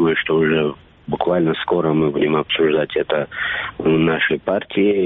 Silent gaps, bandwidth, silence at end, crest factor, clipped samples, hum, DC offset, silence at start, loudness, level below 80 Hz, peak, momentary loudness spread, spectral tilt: none; 4 kHz; 0 s; 14 dB; under 0.1%; none; under 0.1%; 0 s; -18 LUFS; -50 dBFS; -4 dBFS; 6 LU; -4 dB/octave